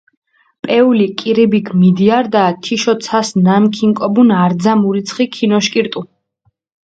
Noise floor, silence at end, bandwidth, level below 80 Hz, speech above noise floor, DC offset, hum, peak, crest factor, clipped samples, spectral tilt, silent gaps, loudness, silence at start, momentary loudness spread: -62 dBFS; 0.8 s; 8.8 kHz; -58 dBFS; 50 dB; under 0.1%; none; 0 dBFS; 12 dB; under 0.1%; -6 dB/octave; none; -13 LUFS; 0.65 s; 6 LU